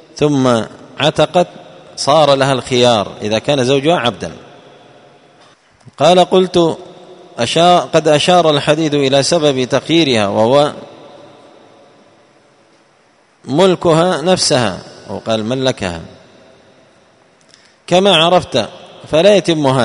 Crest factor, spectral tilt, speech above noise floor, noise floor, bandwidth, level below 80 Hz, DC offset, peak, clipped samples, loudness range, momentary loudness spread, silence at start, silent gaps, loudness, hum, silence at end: 14 dB; -4.5 dB/octave; 40 dB; -52 dBFS; 11 kHz; -50 dBFS; under 0.1%; 0 dBFS; under 0.1%; 7 LU; 11 LU; 0.15 s; none; -12 LUFS; none; 0 s